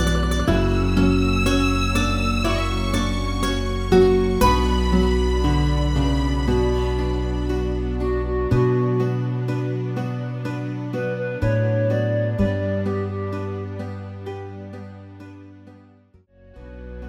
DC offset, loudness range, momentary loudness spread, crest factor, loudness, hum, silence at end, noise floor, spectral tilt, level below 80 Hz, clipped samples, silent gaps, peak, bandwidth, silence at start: under 0.1%; 10 LU; 15 LU; 18 dB; -21 LUFS; none; 0 s; -53 dBFS; -6.5 dB/octave; -26 dBFS; under 0.1%; none; -4 dBFS; 16 kHz; 0 s